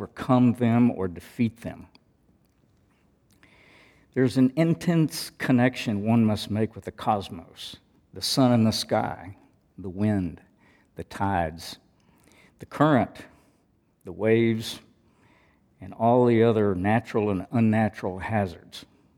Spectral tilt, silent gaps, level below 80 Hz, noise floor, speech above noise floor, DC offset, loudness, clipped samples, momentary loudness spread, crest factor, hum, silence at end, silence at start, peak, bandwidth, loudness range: -6.5 dB/octave; none; -58 dBFS; -66 dBFS; 42 dB; under 0.1%; -24 LUFS; under 0.1%; 19 LU; 20 dB; none; 0.35 s; 0 s; -6 dBFS; 17 kHz; 6 LU